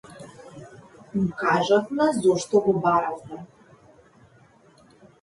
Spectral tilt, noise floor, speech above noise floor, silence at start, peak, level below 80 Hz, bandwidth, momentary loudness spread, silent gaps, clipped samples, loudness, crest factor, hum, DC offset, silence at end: -5.5 dB/octave; -56 dBFS; 34 dB; 0.1 s; -8 dBFS; -62 dBFS; 11.5 kHz; 24 LU; none; under 0.1%; -22 LUFS; 18 dB; none; under 0.1%; 1.75 s